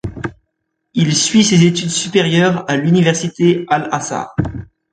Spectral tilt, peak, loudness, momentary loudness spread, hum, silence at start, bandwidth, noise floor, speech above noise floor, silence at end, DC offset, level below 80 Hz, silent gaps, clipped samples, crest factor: -4.5 dB/octave; 0 dBFS; -14 LUFS; 13 LU; none; 0.05 s; 9.4 kHz; -71 dBFS; 58 dB; 0.3 s; under 0.1%; -42 dBFS; none; under 0.1%; 14 dB